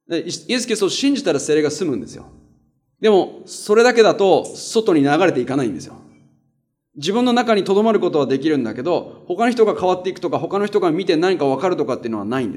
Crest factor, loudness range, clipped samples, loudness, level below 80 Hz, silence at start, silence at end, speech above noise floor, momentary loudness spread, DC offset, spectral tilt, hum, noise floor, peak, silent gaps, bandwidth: 18 dB; 3 LU; under 0.1%; -18 LUFS; -64 dBFS; 0.1 s; 0 s; 50 dB; 10 LU; under 0.1%; -4.5 dB/octave; none; -68 dBFS; 0 dBFS; none; 13.5 kHz